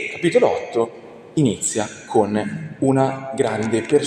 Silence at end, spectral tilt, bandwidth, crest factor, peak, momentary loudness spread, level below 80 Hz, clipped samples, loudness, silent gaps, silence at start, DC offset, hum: 0 s; -5 dB/octave; 13.5 kHz; 18 dB; -2 dBFS; 8 LU; -58 dBFS; under 0.1%; -20 LUFS; none; 0 s; under 0.1%; none